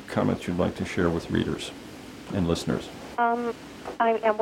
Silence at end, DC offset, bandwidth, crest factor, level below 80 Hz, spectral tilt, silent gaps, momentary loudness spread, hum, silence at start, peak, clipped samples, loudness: 0 s; under 0.1%; 16.5 kHz; 18 dB; -50 dBFS; -6 dB/octave; none; 13 LU; none; 0 s; -10 dBFS; under 0.1%; -27 LUFS